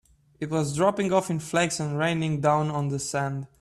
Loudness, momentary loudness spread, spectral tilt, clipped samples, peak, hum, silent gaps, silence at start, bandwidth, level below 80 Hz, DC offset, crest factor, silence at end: -26 LUFS; 6 LU; -5.5 dB/octave; under 0.1%; -8 dBFS; none; none; 0.4 s; 13 kHz; -60 dBFS; under 0.1%; 18 dB; 0.15 s